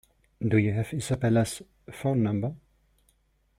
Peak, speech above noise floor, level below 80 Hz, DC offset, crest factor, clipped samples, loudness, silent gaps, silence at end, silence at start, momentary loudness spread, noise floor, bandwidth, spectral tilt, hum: -10 dBFS; 42 dB; -56 dBFS; under 0.1%; 20 dB; under 0.1%; -27 LUFS; none; 1 s; 0.4 s; 10 LU; -68 dBFS; 15 kHz; -7 dB/octave; none